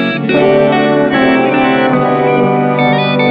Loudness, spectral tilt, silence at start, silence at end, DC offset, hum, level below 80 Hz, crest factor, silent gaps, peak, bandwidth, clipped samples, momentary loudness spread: -10 LUFS; -9 dB/octave; 0 s; 0 s; under 0.1%; none; -46 dBFS; 10 dB; none; 0 dBFS; 5.2 kHz; under 0.1%; 2 LU